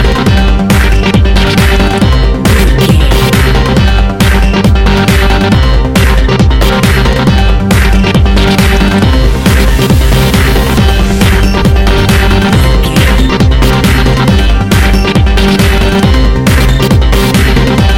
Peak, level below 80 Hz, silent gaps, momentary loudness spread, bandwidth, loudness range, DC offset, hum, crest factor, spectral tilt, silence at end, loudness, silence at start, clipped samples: 0 dBFS; -10 dBFS; none; 1 LU; 17 kHz; 0 LU; under 0.1%; none; 6 dB; -5.5 dB/octave; 0 s; -8 LUFS; 0 s; 0.2%